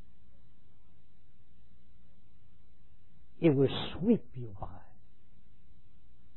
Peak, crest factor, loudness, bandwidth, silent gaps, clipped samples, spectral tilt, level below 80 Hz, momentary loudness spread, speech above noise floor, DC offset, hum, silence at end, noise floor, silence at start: -14 dBFS; 22 dB; -31 LUFS; 4 kHz; none; under 0.1%; -6.5 dB/octave; -58 dBFS; 21 LU; 35 dB; 1%; none; 1.6 s; -65 dBFS; 3.4 s